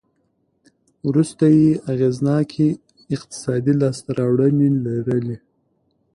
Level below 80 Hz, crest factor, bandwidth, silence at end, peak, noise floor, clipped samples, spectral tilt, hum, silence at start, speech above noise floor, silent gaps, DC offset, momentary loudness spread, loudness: -56 dBFS; 14 dB; 11 kHz; 0.8 s; -6 dBFS; -67 dBFS; under 0.1%; -8 dB/octave; none; 1.05 s; 49 dB; none; under 0.1%; 13 LU; -19 LUFS